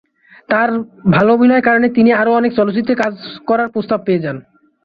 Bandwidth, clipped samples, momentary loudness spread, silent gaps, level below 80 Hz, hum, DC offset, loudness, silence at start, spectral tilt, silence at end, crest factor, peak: 6.6 kHz; under 0.1%; 8 LU; none; -52 dBFS; none; under 0.1%; -14 LUFS; 0.5 s; -8.5 dB/octave; 0.45 s; 14 dB; -2 dBFS